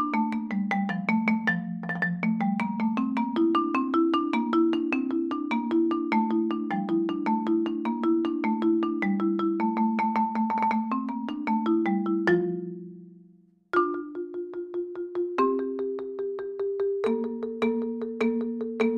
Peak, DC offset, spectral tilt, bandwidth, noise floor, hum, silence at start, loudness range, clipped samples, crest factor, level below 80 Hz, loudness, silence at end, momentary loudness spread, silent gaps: -10 dBFS; under 0.1%; -8 dB/octave; 6.8 kHz; -58 dBFS; none; 0 s; 4 LU; under 0.1%; 16 dB; -70 dBFS; -27 LUFS; 0 s; 8 LU; none